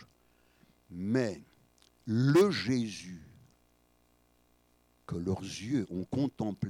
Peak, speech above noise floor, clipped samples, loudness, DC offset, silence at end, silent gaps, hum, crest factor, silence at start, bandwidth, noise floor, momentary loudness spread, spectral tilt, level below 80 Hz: -16 dBFS; 38 dB; under 0.1%; -31 LUFS; under 0.1%; 0 s; none; 60 Hz at -60 dBFS; 18 dB; 0 s; 18 kHz; -69 dBFS; 22 LU; -6.5 dB/octave; -64 dBFS